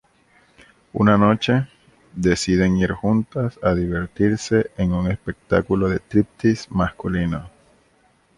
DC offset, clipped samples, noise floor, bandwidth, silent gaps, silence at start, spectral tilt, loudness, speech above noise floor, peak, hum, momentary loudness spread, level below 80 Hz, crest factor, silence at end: under 0.1%; under 0.1%; -59 dBFS; 11.5 kHz; none; 0.95 s; -6.5 dB/octave; -20 LUFS; 40 dB; -2 dBFS; none; 8 LU; -40 dBFS; 18 dB; 0.9 s